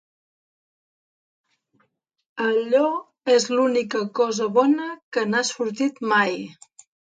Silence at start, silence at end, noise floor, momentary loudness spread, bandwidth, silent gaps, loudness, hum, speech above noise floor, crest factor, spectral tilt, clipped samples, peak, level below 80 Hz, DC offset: 2.35 s; 0.65 s; -69 dBFS; 8 LU; 9.4 kHz; 5.02-5.12 s; -22 LUFS; none; 48 dB; 18 dB; -3.5 dB/octave; under 0.1%; -6 dBFS; -76 dBFS; under 0.1%